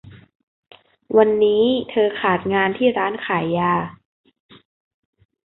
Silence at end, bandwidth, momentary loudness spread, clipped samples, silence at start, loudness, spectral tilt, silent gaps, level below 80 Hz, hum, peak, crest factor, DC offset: 1.6 s; 4.1 kHz; 6 LU; under 0.1%; 0.05 s; -19 LUFS; -10.5 dB/octave; 0.35-0.63 s; -58 dBFS; none; -2 dBFS; 20 dB; under 0.1%